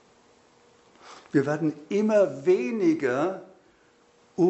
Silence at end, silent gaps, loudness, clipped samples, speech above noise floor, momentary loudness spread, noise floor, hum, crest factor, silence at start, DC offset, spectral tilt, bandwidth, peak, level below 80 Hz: 0 s; none; -25 LUFS; under 0.1%; 37 dB; 7 LU; -60 dBFS; none; 16 dB; 1.05 s; under 0.1%; -7 dB/octave; 8.2 kHz; -10 dBFS; -74 dBFS